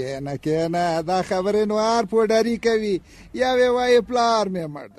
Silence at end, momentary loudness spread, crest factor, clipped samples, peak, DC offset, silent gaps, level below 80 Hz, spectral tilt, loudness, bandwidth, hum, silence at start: 0.1 s; 9 LU; 14 dB; under 0.1%; -8 dBFS; under 0.1%; none; -52 dBFS; -5 dB/octave; -21 LUFS; 13 kHz; none; 0 s